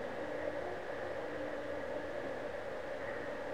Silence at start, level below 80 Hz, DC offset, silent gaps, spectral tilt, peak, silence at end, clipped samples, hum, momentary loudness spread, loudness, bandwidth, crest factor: 0 s; -64 dBFS; 0.3%; none; -5.5 dB/octave; -26 dBFS; 0 s; under 0.1%; none; 2 LU; -41 LUFS; 15 kHz; 16 dB